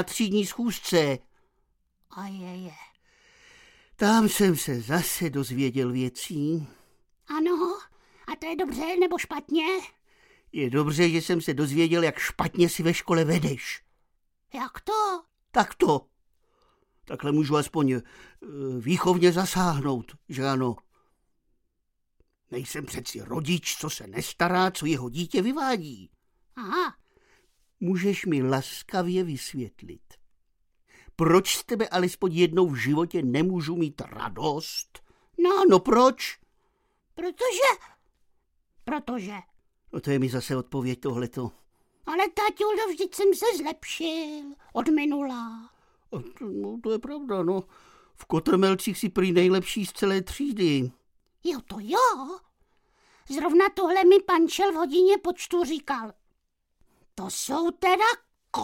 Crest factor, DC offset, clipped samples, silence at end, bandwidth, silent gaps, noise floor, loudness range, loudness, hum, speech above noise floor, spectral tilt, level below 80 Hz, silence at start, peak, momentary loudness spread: 22 dB; under 0.1%; under 0.1%; 0 s; 17 kHz; none; -75 dBFS; 7 LU; -26 LUFS; none; 50 dB; -5 dB/octave; -58 dBFS; 0 s; -4 dBFS; 15 LU